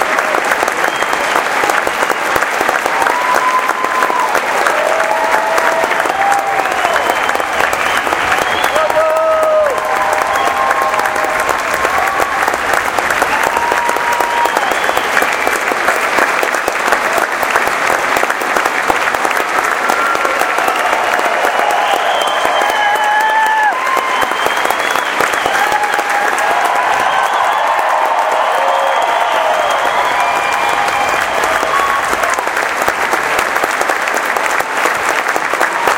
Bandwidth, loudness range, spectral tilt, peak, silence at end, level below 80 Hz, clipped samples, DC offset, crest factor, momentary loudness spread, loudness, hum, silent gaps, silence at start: 17.5 kHz; 1 LU; -1.5 dB/octave; 0 dBFS; 0 s; -48 dBFS; under 0.1%; under 0.1%; 14 dB; 2 LU; -13 LUFS; none; none; 0 s